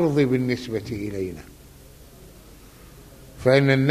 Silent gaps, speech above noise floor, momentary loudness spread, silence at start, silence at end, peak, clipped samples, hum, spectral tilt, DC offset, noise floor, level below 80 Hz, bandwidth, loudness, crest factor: none; 26 dB; 14 LU; 0 s; 0 s; -4 dBFS; under 0.1%; none; -7 dB/octave; under 0.1%; -47 dBFS; -50 dBFS; 15 kHz; -23 LUFS; 20 dB